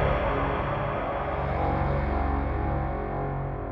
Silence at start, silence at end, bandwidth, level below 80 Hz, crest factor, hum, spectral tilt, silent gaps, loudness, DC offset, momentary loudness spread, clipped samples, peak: 0 s; 0 s; 5.6 kHz; -32 dBFS; 14 dB; none; -9.5 dB/octave; none; -28 LUFS; under 0.1%; 4 LU; under 0.1%; -12 dBFS